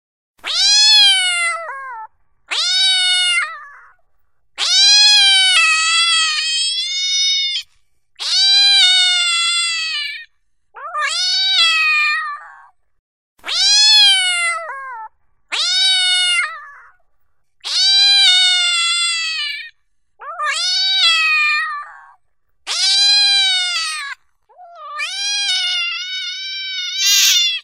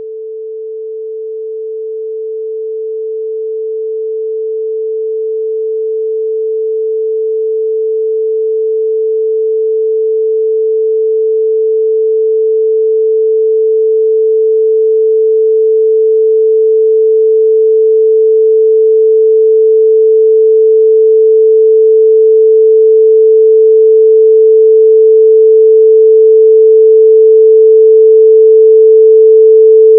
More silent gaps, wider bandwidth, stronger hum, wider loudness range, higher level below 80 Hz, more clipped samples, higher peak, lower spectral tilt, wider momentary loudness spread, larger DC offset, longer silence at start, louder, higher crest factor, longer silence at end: first, 12.99-13.36 s vs none; first, 16 kHz vs 0.5 kHz; neither; second, 5 LU vs 12 LU; first, -68 dBFS vs under -90 dBFS; neither; about the same, 0 dBFS vs 0 dBFS; second, 6.5 dB/octave vs -13.5 dB/octave; first, 17 LU vs 14 LU; first, 0.1% vs under 0.1%; first, 0.45 s vs 0 s; second, -12 LUFS vs -8 LUFS; first, 16 dB vs 8 dB; about the same, 0 s vs 0 s